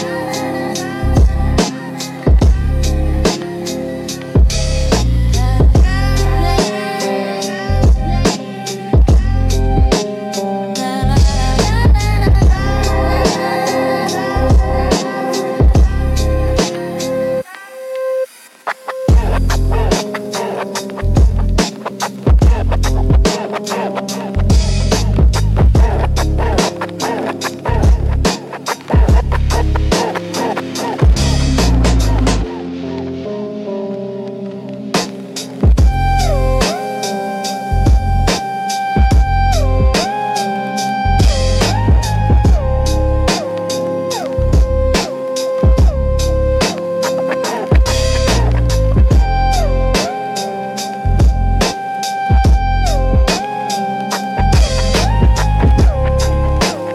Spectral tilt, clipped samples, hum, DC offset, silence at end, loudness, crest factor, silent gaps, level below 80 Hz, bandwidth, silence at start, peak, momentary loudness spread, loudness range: -5.5 dB/octave; under 0.1%; none; under 0.1%; 0 s; -15 LUFS; 12 dB; none; -16 dBFS; 13.5 kHz; 0 s; 0 dBFS; 9 LU; 3 LU